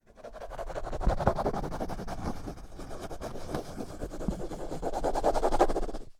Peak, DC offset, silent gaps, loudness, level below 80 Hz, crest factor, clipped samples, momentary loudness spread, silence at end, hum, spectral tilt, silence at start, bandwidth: -8 dBFS; under 0.1%; none; -33 LUFS; -36 dBFS; 24 dB; under 0.1%; 15 LU; 0.1 s; none; -6 dB/octave; 0.15 s; 14.5 kHz